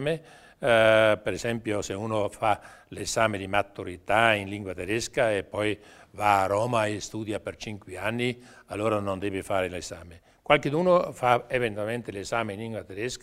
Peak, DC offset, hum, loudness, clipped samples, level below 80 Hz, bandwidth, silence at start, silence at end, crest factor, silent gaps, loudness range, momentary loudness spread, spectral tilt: -4 dBFS; under 0.1%; none; -26 LUFS; under 0.1%; -56 dBFS; 16 kHz; 0 s; 0.05 s; 24 dB; none; 4 LU; 14 LU; -4.5 dB/octave